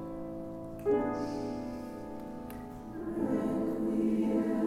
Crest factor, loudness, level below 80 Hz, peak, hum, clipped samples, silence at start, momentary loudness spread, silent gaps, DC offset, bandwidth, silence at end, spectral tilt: 14 dB; -34 LUFS; -56 dBFS; -18 dBFS; none; under 0.1%; 0 s; 13 LU; none; under 0.1%; 15.5 kHz; 0 s; -8 dB/octave